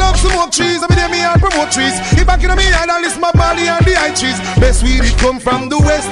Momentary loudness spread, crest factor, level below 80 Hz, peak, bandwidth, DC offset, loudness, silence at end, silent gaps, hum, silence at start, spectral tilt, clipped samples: 3 LU; 10 dB; -16 dBFS; -2 dBFS; 11 kHz; under 0.1%; -12 LUFS; 0 s; none; none; 0 s; -4 dB/octave; under 0.1%